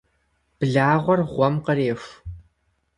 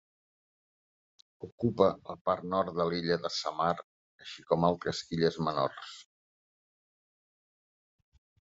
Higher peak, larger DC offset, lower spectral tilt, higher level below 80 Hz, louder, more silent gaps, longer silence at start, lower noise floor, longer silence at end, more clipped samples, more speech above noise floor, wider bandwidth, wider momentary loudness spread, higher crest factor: first, -4 dBFS vs -10 dBFS; neither; first, -8 dB/octave vs -6 dB/octave; first, -50 dBFS vs -68 dBFS; first, -21 LUFS vs -31 LUFS; second, none vs 1.52-1.58 s, 2.21-2.25 s, 3.84-4.19 s; second, 0.6 s vs 1.4 s; second, -69 dBFS vs under -90 dBFS; second, 0.55 s vs 2.5 s; neither; second, 48 dB vs over 59 dB; first, 10.5 kHz vs 8 kHz; about the same, 20 LU vs 18 LU; second, 18 dB vs 24 dB